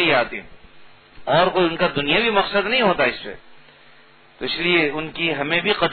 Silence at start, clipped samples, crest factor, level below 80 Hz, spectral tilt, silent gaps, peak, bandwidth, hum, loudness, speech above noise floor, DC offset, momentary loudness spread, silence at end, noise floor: 0 s; under 0.1%; 18 dB; -50 dBFS; -8 dB/octave; none; -4 dBFS; 4.6 kHz; none; -19 LUFS; 31 dB; under 0.1%; 13 LU; 0 s; -51 dBFS